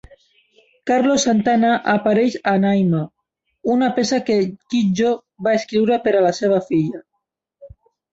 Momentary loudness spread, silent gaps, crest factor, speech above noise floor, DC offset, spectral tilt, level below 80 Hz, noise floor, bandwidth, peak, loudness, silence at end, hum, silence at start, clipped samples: 6 LU; none; 12 dB; 59 dB; under 0.1%; -5.5 dB/octave; -58 dBFS; -76 dBFS; 8 kHz; -6 dBFS; -18 LUFS; 0.45 s; none; 0.85 s; under 0.1%